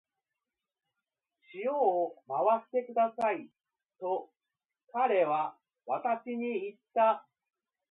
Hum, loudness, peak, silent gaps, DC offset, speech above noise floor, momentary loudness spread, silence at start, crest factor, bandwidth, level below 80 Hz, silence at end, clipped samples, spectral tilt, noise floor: none; -32 LUFS; -16 dBFS; none; under 0.1%; over 60 dB; 10 LU; 1.55 s; 18 dB; 4.2 kHz; -88 dBFS; 0.7 s; under 0.1%; -7 dB/octave; under -90 dBFS